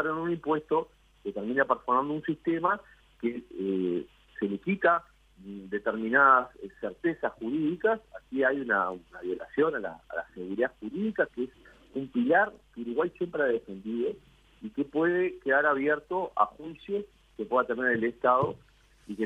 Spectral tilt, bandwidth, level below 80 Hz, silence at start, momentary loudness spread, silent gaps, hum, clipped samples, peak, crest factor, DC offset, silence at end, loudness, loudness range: -8 dB/octave; 8 kHz; -64 dBFS; 0 s; 13 LU; none; none; under 0.1%; -8 dBFS; 22 dB; under 0.1%; 0 s; -29 LUFS; 4 LU